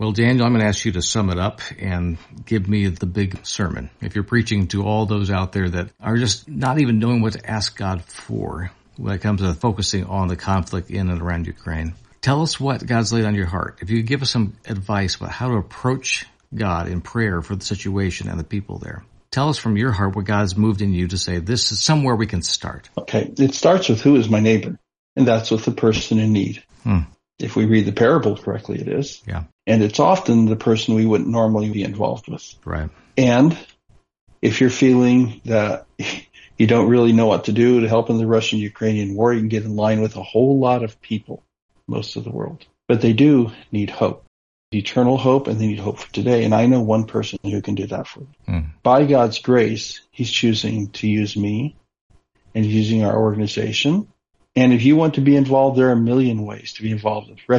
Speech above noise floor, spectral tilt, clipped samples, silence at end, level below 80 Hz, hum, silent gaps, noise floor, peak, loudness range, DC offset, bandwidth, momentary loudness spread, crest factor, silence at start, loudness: 37 dB; -6 dB/octave; under 0.1%; 0 s; -46 dBFS; none; 24.99-25.16 s, 29.52-29.59 s, 34.21-34.27 s, 41.62-41.69 s, 44.27-44.72 s, 52.01-52.10 s; -55 dBFS; -2 dBFS; 6 LU; under 0.1%; 10.5 kHz; 13 LU; 16 dB; 0 s; -19 LUFS